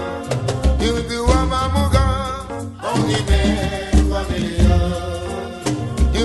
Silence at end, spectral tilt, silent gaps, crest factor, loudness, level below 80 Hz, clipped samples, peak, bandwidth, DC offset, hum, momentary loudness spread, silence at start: 0 s; -6 dB/octave; none; 16 dB; -19 LUFS; -22 dBFS; under 0.1%; -2 dBFS; 12.5 kHz; under 0.1%; none; 9 LU; 0 s